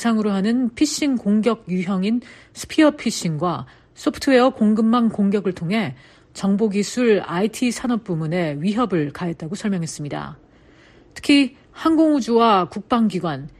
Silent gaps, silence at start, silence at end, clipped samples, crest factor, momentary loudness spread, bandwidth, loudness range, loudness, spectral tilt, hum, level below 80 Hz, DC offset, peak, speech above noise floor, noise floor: none; 0 s; 0.1 s; under 0.1%; 16 dB; 11 LU; 13.5 kHz; 4 LU; -20 LUFS; -5.5 dB/octave; none; -54 dBFS; under 0.1%; -4 dBFS; 31 dB; -50 dBFS